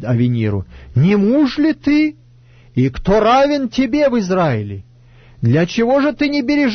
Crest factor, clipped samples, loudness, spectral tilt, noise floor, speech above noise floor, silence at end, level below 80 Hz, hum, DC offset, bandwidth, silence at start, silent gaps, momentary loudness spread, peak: 12 dB; under 0.1%; -15 LUFS; -7.5 dB/octave; -45 dBFS; 31 dB; 0 s; -38 dBFS; none; under 0.1%; 6.6 kHz; 0 s; none; 9 LU; -4 dBFS